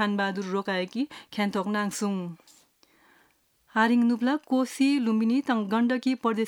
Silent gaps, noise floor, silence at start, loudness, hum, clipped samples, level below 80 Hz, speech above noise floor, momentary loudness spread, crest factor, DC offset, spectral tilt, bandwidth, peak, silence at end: none; -66 dBFS; 0 s; -26 LUFS; none; under 0.1%; -78 dBFS; 40 dB; 8 LU; 18 dB; under 0.1%; -5 dB/octave; 17 kHz; -8 dBFS; 0 s